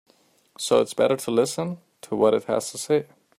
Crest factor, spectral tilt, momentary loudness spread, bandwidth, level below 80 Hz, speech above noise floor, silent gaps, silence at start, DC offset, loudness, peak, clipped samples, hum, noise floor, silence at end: 18 dB; -4.5 dB/octave; 11 LU; 15.5 kHz; -68 dBFS; 36 dB; none; 0.6 s; under 0.1%; -24 LUFS; -6 dBFS; under 0.1%; none; -58 dBFS; 0.35 s